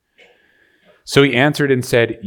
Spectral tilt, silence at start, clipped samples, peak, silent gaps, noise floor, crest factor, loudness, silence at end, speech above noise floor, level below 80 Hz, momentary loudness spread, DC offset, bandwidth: -5.5 dB/octave; 1.05 s; under 0.1%; 0 dBFS; none; -56 dBFS; 18 dB; -15 LUFS; 0 s; 41 dB; -50 dBFS; 4 LU; under 0.1%; 19 kHz